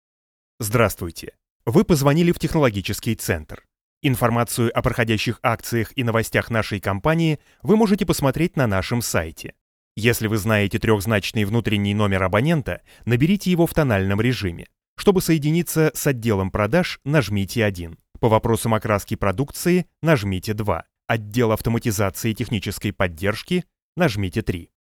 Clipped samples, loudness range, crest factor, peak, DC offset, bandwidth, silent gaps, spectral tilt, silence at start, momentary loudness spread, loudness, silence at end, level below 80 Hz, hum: under 0.1%; 2 LU; 20 dB; -2 dBFS; under 0.1%; 19 kHz; 1.50-1.60 s, 3.81-4.01 s, 9.61-9.95 s, 14.88-14.96 s, 23.82-23.93 s; -5.5 dB/octave; 0.6 s; 8 LU; -21 LUFS; 0.3 s; -42 dBFS; none